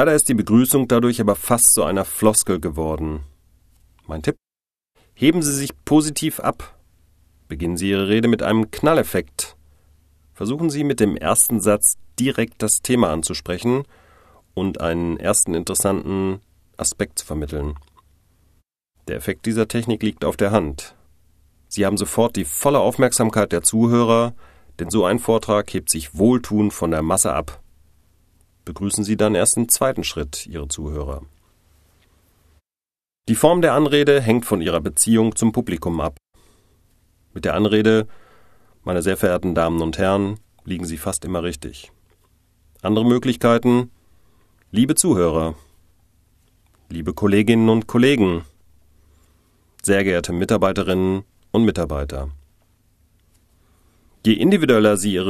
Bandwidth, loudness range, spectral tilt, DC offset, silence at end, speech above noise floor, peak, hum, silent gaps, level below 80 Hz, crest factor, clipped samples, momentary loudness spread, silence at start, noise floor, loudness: 14 kHz; 6 LU; -4.5 dB/octave; under 0.1%; 0 s; over 72 dB; 0 dBFS; none; none; -40 dBFS; 20 dB; under 0.1%; 13 LU; 0 s; under -90 dBFS; -19 LUFS